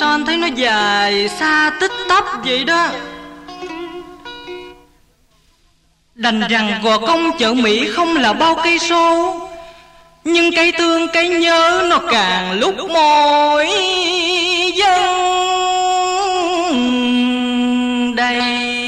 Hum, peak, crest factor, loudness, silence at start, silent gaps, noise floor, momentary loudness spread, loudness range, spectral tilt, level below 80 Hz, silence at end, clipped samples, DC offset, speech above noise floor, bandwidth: none; -2 dBFS; 12 dB; -14 LUFS; 0 s; none; -56 dBFS; 16 LU; 8 LU; -2.5 dB/octave; -50 dBFS; 0 s; under 0.1%; under 0.1%; 42 dB; 12.5 kHz